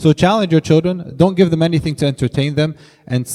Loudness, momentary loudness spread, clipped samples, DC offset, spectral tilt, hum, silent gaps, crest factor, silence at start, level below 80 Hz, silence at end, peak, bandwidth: -15 LUFS; 8 LU; under 0.1%; under 0.1%; -6.5 dB/octave; none; none; 14 dB; 0 s; -44 dBFS; 0 s; 0 dBFS; 13 kHz